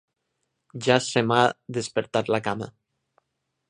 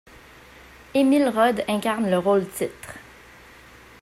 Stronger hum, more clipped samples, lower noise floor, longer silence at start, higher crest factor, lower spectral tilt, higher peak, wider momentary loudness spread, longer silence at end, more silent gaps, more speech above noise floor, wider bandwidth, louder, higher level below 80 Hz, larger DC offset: neither; neither; first, -79 dBFS vs -48 dBFS; second, 0.75 s vs 0.95 s; first, 24 dB vs 16 dB; about the same, -4.5 dB/octave vs -5.5 dB/octave; first, -2 dBFS vs -8 dBFS; second, 12 LU vs 18 LU; about the same, 1 s vs 1 s; neither; first, 55 dB vs 27 dB; second, 10.5 kHz vs 15.5 kHz; about the same, -24 LUFS vs -22 LUFS; second, -64 dBFS vs -56 dBFS; neither